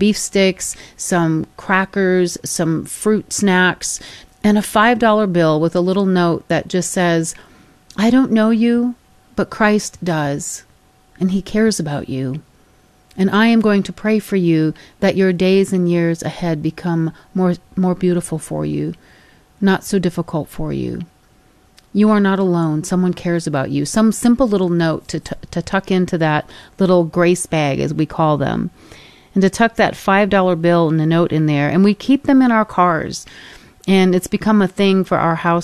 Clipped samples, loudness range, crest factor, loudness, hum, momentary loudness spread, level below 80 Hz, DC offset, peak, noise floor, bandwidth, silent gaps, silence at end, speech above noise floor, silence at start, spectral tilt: under 0.1%; 5 LU; 16 dB; -16 LUFS; none; 10 LU; -44 dBFS; under 0.1%; -2 dBFS; -52 dBFS; 13.5 kHz; none; 0 s; 36 dB; 0 s; -5.5 dB/octave